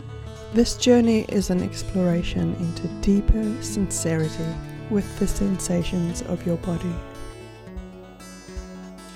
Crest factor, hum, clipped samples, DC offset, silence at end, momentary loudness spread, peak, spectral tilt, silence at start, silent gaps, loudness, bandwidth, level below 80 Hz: 20 dB; none; under 0.1%; under 0.1%; 0 s; 19 LU; -4 dBFS; -5.5 dB/octave; 0 s; none; -24 LUFS; 16 kHz; -34 dBFS